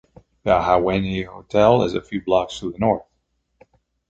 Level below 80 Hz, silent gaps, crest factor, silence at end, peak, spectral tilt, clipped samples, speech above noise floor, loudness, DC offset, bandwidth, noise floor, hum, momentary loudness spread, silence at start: -44 dBFS; none; 20 dB; 1.1 s; -2 dBFS; -6.5 dB/octave; under 0.1%; 51 dB; -20 LUFS; under 0.1%; 8.2 kHz; -70 dBFS; none; 11 LU; 0.45 s